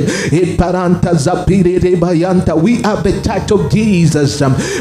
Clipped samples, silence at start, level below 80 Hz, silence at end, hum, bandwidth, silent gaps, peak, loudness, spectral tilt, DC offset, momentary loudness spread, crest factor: under 0.1%; 0 s; -28 dBFS; 0 s; none; 12.5 kHz; none; 0 dBFS; -12 LUFS; -6.5 dB/octave; under 0.1%; 3 LU; 12 dB